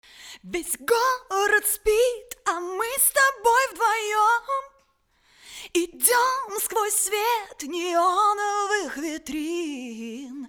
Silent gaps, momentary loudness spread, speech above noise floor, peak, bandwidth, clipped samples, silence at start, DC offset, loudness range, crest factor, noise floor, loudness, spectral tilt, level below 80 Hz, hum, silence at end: none; 13 LU; 41 dB; -4 dBFS; over 20 kHz; under 0.1%; 0.2 s; under 0.1%; 3 LU; 20 dB; -65 dBFS; -23 LUFS; -0.5 dB/octave; -56 dBFS; none; 0 s